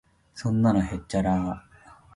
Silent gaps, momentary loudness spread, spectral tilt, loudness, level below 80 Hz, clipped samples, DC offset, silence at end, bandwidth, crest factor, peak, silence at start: none; 14 LU; -7.5 dB/octave; -26 LUFS; -44 dBFS; under 0.1%; under 0.1%; 0.2 s; 11.5 kHz; 18 dB; -10 dBFS; 0.35 s